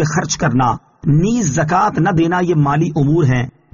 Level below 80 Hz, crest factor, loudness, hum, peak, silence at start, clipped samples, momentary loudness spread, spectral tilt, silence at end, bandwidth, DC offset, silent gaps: -40 dBFS; 12 dB; -15 LUFS; none; -4 dBFS; 0 s; under 0.1%; 3 LU; -6.5 dB/octave; 0.25 s; 7.4 kHz; under 0.1%; none